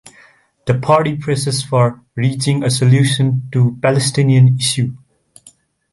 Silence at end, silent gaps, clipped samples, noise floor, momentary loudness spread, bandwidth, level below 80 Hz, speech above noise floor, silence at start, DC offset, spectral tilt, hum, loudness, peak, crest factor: 0.95 s; none; under 0.1%; -49 dBFS; 8 LU; 11.5 kHz; -52 dBFS; 35 dB; 0.65 s; under 0.1%; -5.5 dB/octave; none; -15 LUFS; -2 dBFS; 14 dB